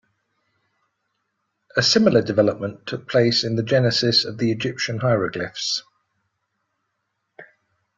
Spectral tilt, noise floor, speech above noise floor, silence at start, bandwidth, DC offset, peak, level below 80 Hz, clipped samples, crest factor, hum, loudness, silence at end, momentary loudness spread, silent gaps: -4.5 dB/octave; -76 dBFS; 56 dB; 1.75 s; 7.8 kHz; under 0.1%; -2 dBFS; -58 dBFS; under 0.1%; 20 dB; none; -20 LUFS; 0.55 s; 10 LU; none